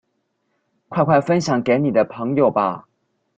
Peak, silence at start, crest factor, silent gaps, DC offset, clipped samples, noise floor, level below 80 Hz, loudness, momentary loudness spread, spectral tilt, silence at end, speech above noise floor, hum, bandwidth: 0 dBFS; 0.9 s; 20 dB; none; under 0.1%; under 0.1%; -71 dBFS; -60 dBFS; -19 LUFS; 7 LU; -7 dB/octave; 0.55 s; 53 dB; none; 8.8 kHz